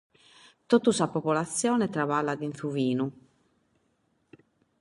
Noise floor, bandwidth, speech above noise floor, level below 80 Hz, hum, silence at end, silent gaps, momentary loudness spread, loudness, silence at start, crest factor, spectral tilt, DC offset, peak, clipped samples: -72 dBFS; 11.5 kHz; 45 dB; -72 dBFS; none; 1.7 s; none; 8 LU; -27 LUFS; 0.7 s; 20 dB; -5 dB/octave; under 0.1%; -8 dBFS; under 0.1%